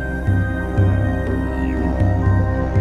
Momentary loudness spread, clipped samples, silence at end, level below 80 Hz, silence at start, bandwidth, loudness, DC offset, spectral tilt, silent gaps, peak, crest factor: 4 LU; under 0.1%; 0 s; -24 dBFS; 0 s; 4 kHz; -19 LUFS; 0.3%; -9 dB/octave; none; -6 dBFS; 12 dB